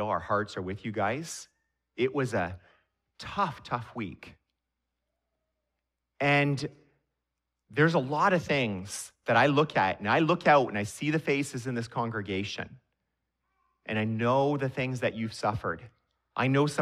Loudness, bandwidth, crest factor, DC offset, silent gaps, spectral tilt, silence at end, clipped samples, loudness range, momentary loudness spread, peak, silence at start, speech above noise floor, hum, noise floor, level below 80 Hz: -29 LUFS; 14 kHz; 20 dB; under 0.1%; none; -5.5 dB/octave; 0 s; under 0.1%; 8 LU; 15 LU; -8 dBFS; 0 s; 57 dB; none; -85 dBFS; -64 dBFS